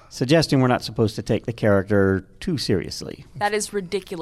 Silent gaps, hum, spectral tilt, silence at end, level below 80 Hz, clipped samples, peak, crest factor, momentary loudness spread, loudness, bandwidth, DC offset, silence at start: none; none; -5.5 dB/octave; 0 s; -48 dBFS; under 0.1%; -6 dBFS; 16 dB; 10 LU; -22 LUFS; 14.5 kHz; under 0.1%; 0.1 s